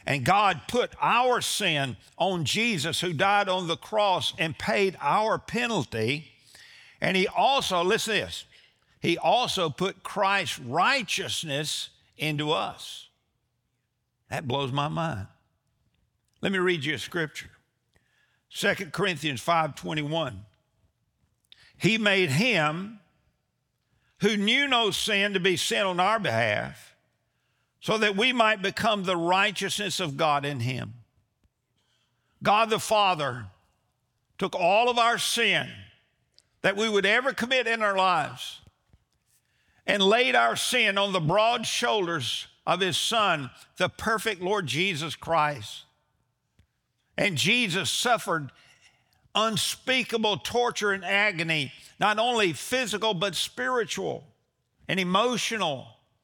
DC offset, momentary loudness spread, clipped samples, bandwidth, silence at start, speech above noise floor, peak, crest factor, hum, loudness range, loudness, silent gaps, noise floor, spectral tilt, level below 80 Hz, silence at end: under 0.1%; 10 LU; under 0.1%; over 20 kHz; 0.05 s; 51 dB; -6 dBFS; 20 dB; none; 6 LU; -25 LUFS; none; -77 dBFS; -3.5 dB/octave; -64 dBFS; 0.35 s